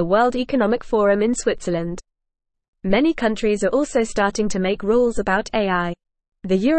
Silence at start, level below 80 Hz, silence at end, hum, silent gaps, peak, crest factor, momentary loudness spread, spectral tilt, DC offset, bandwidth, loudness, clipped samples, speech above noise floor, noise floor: 0 s; -42 dBFS; 0 s; none; 2.68-2.73 s; -4 dBFS; 16 dB; 9 LU; -5.5 dB/octave; 0.6%; 8.8 kHz; -20 LUFS; under 0.1%; 60 dB; -79 dBFS